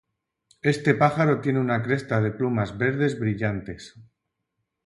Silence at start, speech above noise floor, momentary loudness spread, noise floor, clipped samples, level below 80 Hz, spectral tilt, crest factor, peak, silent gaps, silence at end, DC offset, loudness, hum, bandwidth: 0.65 s; 56 dB; 8 LU; -80 dBFS; under 0.1%; -56 dBFS; -7.5 dB/octave; 20 dB; -4 dBFS; none; 0.85 s; under 0.1%; -24 LUFS; none; 11.5 kHz